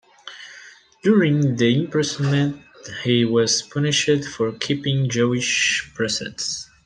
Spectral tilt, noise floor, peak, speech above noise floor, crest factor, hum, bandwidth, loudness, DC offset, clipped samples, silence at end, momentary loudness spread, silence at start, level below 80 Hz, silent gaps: -4.5 dB/octave; -46 dBFS; -4 dBFS; 26 dB; 18 dB; none; 10 kHz; -20 LUFS; under 0.1%; under 0.1%; 0.2 s; 16 LU; 0.25 s; -58 dBFS; none